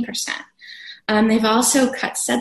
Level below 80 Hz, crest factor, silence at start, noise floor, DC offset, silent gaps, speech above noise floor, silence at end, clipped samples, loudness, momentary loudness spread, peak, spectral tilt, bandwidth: -56 dBFS; 16 dB; 0 s; -40 dBFS; under 0.1%; none; 21 dB; 0 s; under 0.1%; -18 LUFS; 21 LU; -4 dBFS; -2.5 dB/octave; 13 kHz